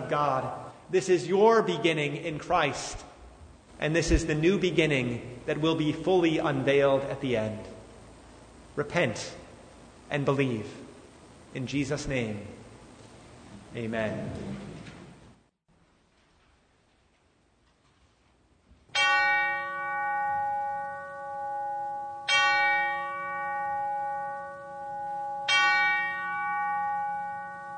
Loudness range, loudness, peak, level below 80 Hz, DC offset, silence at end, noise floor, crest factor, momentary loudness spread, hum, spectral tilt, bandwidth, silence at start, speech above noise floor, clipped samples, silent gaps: 11 LU; -28 LUFS; -10 dBFS; -48 dBFS; under 0.1%; 0 s; -66 dBFS; 20 dB; 18 LU; none; -4.5 dB/octave; 9.6 kHz; 0 s; 39 dB; under 0.1%; none